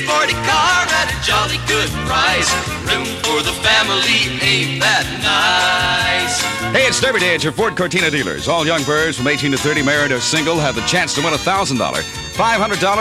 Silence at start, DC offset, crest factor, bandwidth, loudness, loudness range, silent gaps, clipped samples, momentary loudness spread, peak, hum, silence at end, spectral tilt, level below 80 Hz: 0 s; under 0.1%; 14 dB; 16 kHz; -15 LUFS; 2 LU; none; under 0.1%; 5 LU; -2 dBFS; none; 0 s; -2.5 dB/octave; -38 dBFS